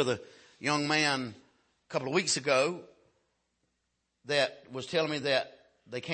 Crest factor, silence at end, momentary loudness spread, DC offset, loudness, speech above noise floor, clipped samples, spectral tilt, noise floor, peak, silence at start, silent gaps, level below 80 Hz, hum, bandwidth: 20 dB; 0 s; 15 LU; under 0.1%; -30 LUFS; 50 dB; under 0.1%; -3 dB/octave; -80 dBFS; -12 dBFS; 0 s; none; -76 dBFS; none; 8.8 kHz